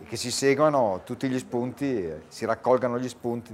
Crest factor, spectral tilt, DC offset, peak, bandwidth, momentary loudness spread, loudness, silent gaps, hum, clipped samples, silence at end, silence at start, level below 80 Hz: 18 dB; -5 dB/octave; under 0.1%; -8 dBFS; 16 kHz; 10 LU; -26 LUFS; none; none; under 0.1%; 0 s; 0 s; -64 dBFS